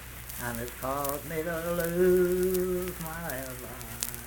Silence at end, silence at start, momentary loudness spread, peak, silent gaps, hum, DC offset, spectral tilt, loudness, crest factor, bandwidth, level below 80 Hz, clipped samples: 0 s; 0 s; 12 LU; -4 dBFS; none; none; under 0.1%; -5 dB/octave; -30 LUFS; 26 dB; 19 kHz; -48 dBFS; under 0.1%